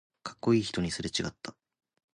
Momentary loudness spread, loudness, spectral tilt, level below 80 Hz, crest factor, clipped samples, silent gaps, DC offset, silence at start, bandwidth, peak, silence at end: 17 LU; -31 LUFS; -5 dB/octave; -56 dBFS; 20 dB; under 0.1%; none; under 0.1%; 0.25 s; 11 kHz; -14 dBFS; 0.65 s